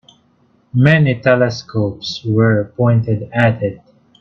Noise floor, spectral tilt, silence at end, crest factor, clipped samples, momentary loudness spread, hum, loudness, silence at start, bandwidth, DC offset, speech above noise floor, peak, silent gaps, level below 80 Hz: -56 dBFS; -7.5 dB/octave; 0.45 s; 16 dB; under 0.1%; 10 LU; none; -15 LUFS; 0.75 s; 7 kHz; under 0.1%; 41 dB; 0 dBFS; none; -50 dBFS